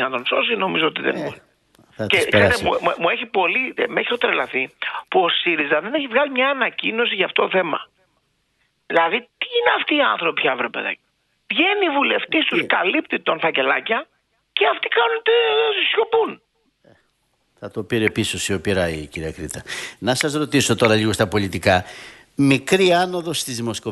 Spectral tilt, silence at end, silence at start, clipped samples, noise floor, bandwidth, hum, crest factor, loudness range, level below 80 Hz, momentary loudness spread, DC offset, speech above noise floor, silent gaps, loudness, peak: -4 dB/octave; 0 s; 0 s; under 0.1%; -67 dBFS; 12 kHz; none; 18 dB; 3 LU; -52 dBFS; 11 LU; under 0.1%; 47 dB; none; -19 LUFS; -2 dBFS